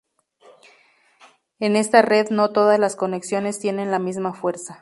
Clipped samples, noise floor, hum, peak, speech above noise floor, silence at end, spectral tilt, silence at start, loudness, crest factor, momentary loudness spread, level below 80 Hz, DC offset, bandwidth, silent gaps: under 0.1%; -57 dBFS; none; 0 dBFS; 38 dB; 0.05 s; -4.5 dB/octave; 1.6 s; -20 LUFS; 20 dB; 10 LU; -72 dBFS; under 0.1%; 11.5 kHz; none